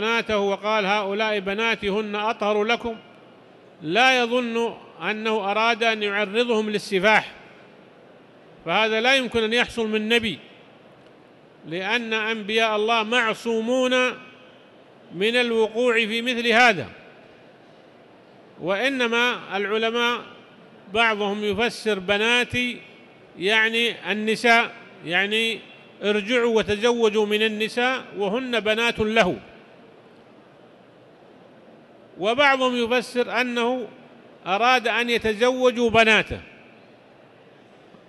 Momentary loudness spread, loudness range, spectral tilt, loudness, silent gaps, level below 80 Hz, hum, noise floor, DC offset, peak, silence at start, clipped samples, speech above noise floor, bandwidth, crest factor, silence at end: 10 LU; 4 LU; -3.5 dB/octave; -21 LUFS; none; -56 dBFS; none; -51 dBFS; under 0.1%; -4 dBFS; 0 s; under 0.1%; 29 dB; 12.5 kHz; 20 dB; 1.6 s